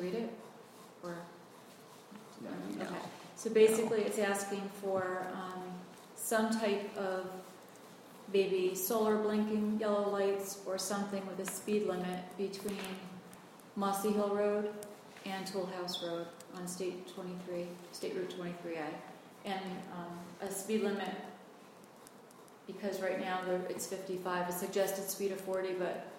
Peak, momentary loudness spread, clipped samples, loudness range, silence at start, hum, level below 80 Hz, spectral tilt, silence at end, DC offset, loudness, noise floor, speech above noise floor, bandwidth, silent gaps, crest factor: -16 dBFS; 21 LU; under 0.1%; 8 LU; 0 s; none; -80 dBFS; -4.5 dB/octave; 0 s; under 0.1%; -37 LUFS; -57 dBFS; 21 dB; 16.5 kHz; none; 22 dB